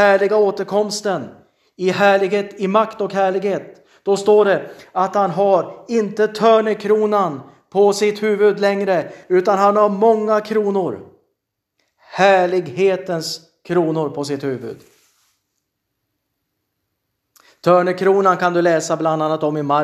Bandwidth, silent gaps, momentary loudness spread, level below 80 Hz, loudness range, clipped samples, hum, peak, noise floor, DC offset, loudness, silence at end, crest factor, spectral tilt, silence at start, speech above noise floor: 13.5 kHz; none; 10 LU; -70 dBFS; 8 LU; under 0.1%; none; 0 dBFS; -75 dBFS; under 0.1%; -17 LUFS; 0 s; 18 dB; -5.5 dB/octave; 0 s; 59 dB